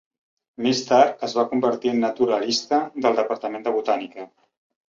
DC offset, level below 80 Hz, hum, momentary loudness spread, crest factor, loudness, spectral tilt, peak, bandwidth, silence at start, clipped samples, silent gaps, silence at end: under 0.1%; -68 dBFS; none; 9 LU; 20 dB; -22 LUFS; -4 dB/octave; -2 dBFS; 7.8 kHz; 0.6 s; under 0.1%; none; 0.6 s